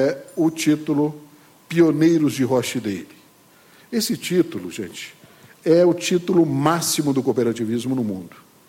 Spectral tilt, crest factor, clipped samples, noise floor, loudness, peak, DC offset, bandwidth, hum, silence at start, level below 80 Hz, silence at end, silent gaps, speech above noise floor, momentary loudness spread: -5 dB/octave; 16 dB; under 0.1%; -52 dBFS; -20 LUFS; -4 dBFS; under 0.1%; 17 kHz; none; 0 s; -64 dBFS; 0.4 s; none; 32 dB; 14 LU